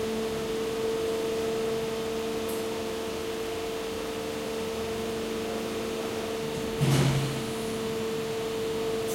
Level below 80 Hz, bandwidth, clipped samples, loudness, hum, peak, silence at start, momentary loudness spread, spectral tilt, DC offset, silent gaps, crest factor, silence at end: -52 dBFS; 16.5 kHz; under 0.1%; -30 LUFS; none; -12 dBFS; 0 s; 5 LU; -5 dB/octave; under 0.1%; none; 18 dB; 0 s